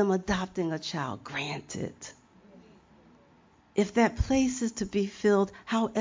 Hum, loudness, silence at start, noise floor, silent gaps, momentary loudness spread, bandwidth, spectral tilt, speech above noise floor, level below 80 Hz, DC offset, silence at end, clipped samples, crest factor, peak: none; -29 LUFS; 0 s; -61 dBFS; none; 11 LU; 7.6 kHz; -5.5 dB/octave; 32 dB; -46 dBFS; under 0.1%; 0 s; under 0.1%; 18 dB; -10 dBFS